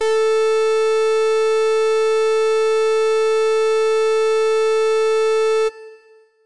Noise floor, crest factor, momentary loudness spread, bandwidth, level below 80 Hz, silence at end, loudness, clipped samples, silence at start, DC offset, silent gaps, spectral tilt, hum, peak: -50 dBFS; 4 dB; 0 LU; 11 kHz; -72 dBFS; 0 s; -17 LUFS; under 0.1%; 0 s; 1%; none; 0 dB/octave; none; -14 dBFS